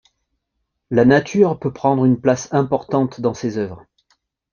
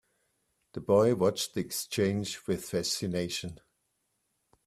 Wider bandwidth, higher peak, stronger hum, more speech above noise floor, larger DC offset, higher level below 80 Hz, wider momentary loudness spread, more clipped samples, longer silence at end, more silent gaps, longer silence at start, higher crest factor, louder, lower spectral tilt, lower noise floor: second, 7.2 kHz vs 15.5 kHz; first, -2 dBFS vs -12 dBFS; neither; first, 58 dB vs 49 dB; neither; first, -54 dBFS vs -64 dBFS; about the same, 10 LU vs 12 LU; neither; second, 0.75 s vs 1.1 s; neither; first, 0.9 s vs 0.75 s; about the same, 18 dB vs 20 dB; first, -18 LUFS vs -30 LUFS; first, -7 dB/octave vs -4.5 dB/octave; about the same, -75 dBFS vs -78 dBFS